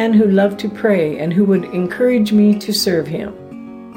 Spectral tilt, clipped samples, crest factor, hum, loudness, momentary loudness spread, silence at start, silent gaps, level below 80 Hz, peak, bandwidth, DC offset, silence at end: -6 dB/octave; under 0.1%; 12 dB; none; -15 LUFS; 15 LU; 0 s; none; -56 dBFS; -4 dBFS; 16.5 kHz; under 0.1%; 0.05 s